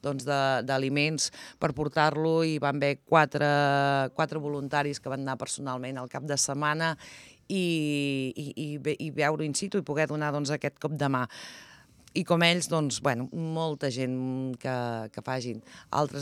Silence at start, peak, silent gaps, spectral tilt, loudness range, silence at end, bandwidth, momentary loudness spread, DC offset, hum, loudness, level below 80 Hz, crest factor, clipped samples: 0.05 s; -6 dBFS; none; -4.5 dB/octave; 5 LU; 0 s; 14 kHz; 11 LU; under 0.1%; none; -28 LUFS; -68 dBFS; 22 dB; under 0.1%